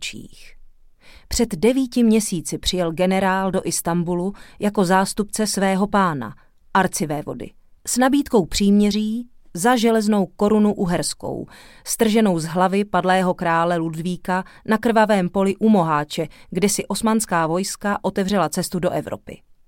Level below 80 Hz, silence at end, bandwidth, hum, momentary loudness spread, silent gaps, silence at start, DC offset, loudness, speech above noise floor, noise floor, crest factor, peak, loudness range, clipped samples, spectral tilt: -44 dBFS; 0.3 s; 17 kHz; none; 11 LU; none; 0 s; under 0.1%; -20 LUFS; 27 dB; -47 dBFS; 16 dB; -4 dBFS; 2 LU; under 0.1%; -5 dB/octave